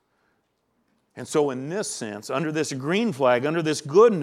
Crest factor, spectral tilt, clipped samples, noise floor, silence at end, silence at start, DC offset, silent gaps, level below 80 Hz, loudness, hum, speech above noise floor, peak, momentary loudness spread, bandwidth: 20 dB; -5 dB/octave; under 0.1%; -71 dBFS; 0 s; 1.15 s; under 0.1%; none; -76 dBFS; -24 LUFS; none; 49 dB; -4 dBFS; 10 LU; 13.5 kHz